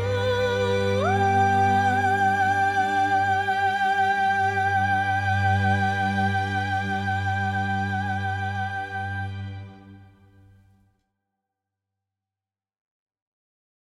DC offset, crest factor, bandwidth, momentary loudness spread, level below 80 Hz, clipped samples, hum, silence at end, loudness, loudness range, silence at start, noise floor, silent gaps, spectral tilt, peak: under 0.1%; 14 dB; 12 kHz; 9 LU; -58 dBFS; under 0.1%; none; 3.8 s; -23 LUFS; 12 LU; 0 s; under -90 dBFS; none; -6 dB/octave; -10 dBFS